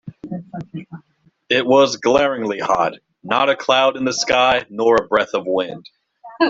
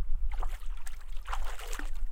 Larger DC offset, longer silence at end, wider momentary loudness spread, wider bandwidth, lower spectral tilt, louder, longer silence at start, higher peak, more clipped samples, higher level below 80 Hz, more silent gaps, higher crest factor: neither; about the same, 0 s vs 0 s; first, 17 LU vs 8 LU; second, 7.8 kHz vs 13.5 kHz; about the same, -3.5 dB/octave vs -3.5 dB/octave; first, -17 LUFS vs -41 LUFS; about the same, 0.05 s vs 0 s; first, 0 dBFS vs -16 dBFS; neither; second, -56 dBFS vs -32 dBFS; neither; first, 18 dB vs 12 dB